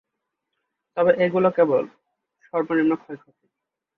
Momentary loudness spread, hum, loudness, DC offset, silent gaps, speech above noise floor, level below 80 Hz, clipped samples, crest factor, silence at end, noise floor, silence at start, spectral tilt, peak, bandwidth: 17 LU; none; -21 LUFS; under 0.1%; none; 62 dB; -68 dBFS; under 0.1%; 18 dB; 0.8 s; -83 dBFS; 0.95 s; -9 dB/octave; -6 dBFS; 4.4 kHz